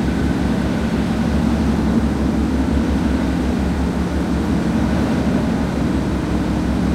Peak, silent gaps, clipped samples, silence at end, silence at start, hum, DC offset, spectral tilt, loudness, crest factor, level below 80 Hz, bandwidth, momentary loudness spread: -6 dBFS; none; under 0.1%; 0 s; 0 s; none; under 0.1%; -7 dB/octave; -19 LUFS; 12 dB; -24 dBFS; 14.5 kHz; 2 LU